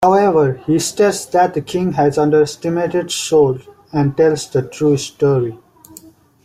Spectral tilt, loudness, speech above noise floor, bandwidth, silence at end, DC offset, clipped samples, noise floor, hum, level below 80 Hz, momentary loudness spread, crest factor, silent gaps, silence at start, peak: -5.5 dB/octave; -16 LUFS; 28 dB; 16 kHz; 0.9 s; under 0.1%; under 0.1%; -43 dBFS; none; -52 dBFS; 6 LU; 14 dB; none; 0 s; -2 dBFS